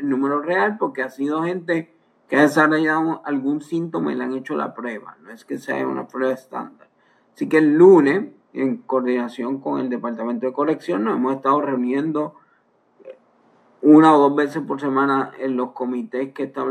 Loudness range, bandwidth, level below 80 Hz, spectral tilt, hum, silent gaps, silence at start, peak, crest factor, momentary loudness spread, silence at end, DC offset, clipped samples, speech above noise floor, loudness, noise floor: 7 LU; 12.5 kHz; -80 dBFS; -7 dB/octave; none; none; 0 s; 0 dBFS; 18 dB; 14 LU; 0 s; under 0.1%; under 0.1%; 42 dB; -20 LUFS; -61 dBFS